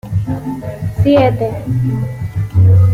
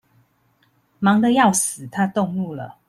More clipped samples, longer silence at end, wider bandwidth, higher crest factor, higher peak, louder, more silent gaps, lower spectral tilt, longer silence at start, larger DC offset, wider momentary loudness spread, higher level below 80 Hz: neither; second, 0 s vs 0.2 s; second, 4.9 kHz vs 15 kHz; second, 12 dB vs 18 dB; about the same, -2 dBFS vs -4 dBFS; first, -15 LUFS vs -19 LUFS; neither; first, -9 dB/octave vs -4.5 dB/octave; second, 0.05 s vs 1 s; neither; about the same, 11 LU vs 10 LU; first, -34 dBFS vs -62 dBFS